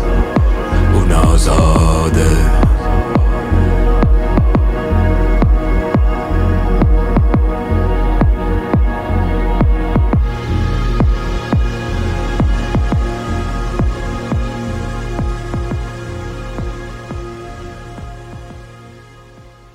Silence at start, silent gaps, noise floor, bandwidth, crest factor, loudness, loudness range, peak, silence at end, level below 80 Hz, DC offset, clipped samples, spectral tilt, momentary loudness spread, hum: 0 s; none; -40 dBFS; 11.5 kHz; 14 dB; -16 LUFS; 11 LU; 0 dBFS; 0.25 s; -16 dBFS; under 0.1%; under 0.1%; -7 dB/octave; 14 LU; none